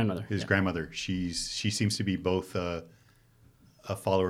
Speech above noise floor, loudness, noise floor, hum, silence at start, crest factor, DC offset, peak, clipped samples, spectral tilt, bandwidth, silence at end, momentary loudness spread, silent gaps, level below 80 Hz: 31 dB; -31 LUFS; -61 dBFS; none; 0 s; 20 dB; under 0.1%; -10 dBFS; under 0.1%; -5 dB/octave; 15.5 kHz; 0 s; 8 LU; none; -56 dBFS